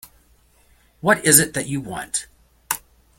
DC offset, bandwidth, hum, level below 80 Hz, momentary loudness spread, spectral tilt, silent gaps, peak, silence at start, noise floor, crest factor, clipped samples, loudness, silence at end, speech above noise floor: under 0.1%; 17 kHz; none; -54 dBFS; 15 LU; -2.5 dB/octave; none; 0 dBFS; 1.05 s; -57 dBFS; 24 dB; under 0.1%; -19 LUFS; 0.4 s; 38 dB